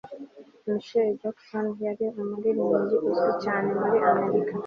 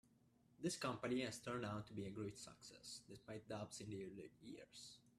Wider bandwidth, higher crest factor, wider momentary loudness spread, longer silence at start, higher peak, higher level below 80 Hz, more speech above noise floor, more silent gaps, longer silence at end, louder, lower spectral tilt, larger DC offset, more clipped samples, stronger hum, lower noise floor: second, 6.6 kHz vs 14.5 kHz; about the same, 18 dB vs 20 dB; second, 11 LU vs 14 LU; second, 0.05 s vs 0.5 s; first, -8 dBFS vs -30 dBFS; first, -70 dBFS vs -78 dBFS; second, 21 dB vs 26 dB; neither; about the same, 0 s vs 0.1 s; first, -26 LUFS vs -50 LUFS; first, -8 dB/octave vs -4.5 dB/octave; neither; neither; neither; second, -46 dBFS vs -75 dBFS